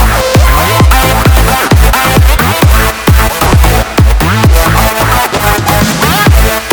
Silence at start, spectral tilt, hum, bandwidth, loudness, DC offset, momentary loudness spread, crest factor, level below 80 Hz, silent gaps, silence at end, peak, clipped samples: 0 s; -4.5 dB/octave; none; over 20 kHz; -7 LUFS; under 0.1%; 2 LU; 6 dB; -10 dBFS; none; 0 s; 0 dBFS; 2%